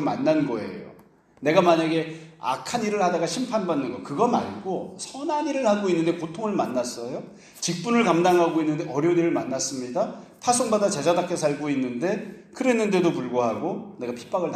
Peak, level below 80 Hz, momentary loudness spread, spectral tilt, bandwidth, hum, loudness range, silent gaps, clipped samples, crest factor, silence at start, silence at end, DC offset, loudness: -4 dBFS; -66 dBFS; 12 LU; -5 dB/octave; 14 kHz; none; 3 LU; none; under 0.1%; 20 dB; 0 s; 0 s; under 0.1%; -24 LUFS